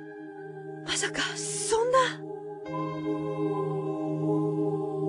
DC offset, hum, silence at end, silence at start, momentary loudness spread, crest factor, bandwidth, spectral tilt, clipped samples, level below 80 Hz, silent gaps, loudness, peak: under 0.1%; none; 0 s; 0 s; 15 LU; 18 dB; 12.5 kHz; -4 dB/octave; under 0.1%; -66 dBFS; none; -29 LUFS; -12 dBFS